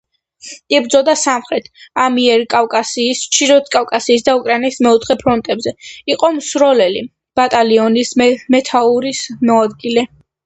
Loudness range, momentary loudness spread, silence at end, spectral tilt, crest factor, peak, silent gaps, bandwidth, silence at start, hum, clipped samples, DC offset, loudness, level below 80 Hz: 1 LU; 9 LU; 0.4 s; -2.5 dB/octave; 14 dB; 0 dBFS; none; 9 kHz; 0.45 s; none; under 0.1%; under 0.1%; -13 LUFS; -52 dBFS